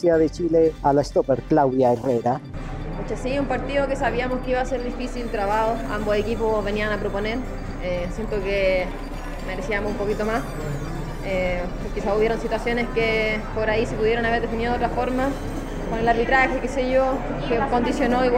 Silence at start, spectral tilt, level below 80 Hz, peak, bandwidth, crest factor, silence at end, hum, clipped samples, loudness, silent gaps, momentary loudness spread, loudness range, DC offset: 0 s; -6 dB/octave; -32 dBFS; -6 dBFS; 15.5 kHz; 18 dB; 0 s; none; under 0.1%; -23 LUFS; none; 10 LU; 4 LU; under 0.1%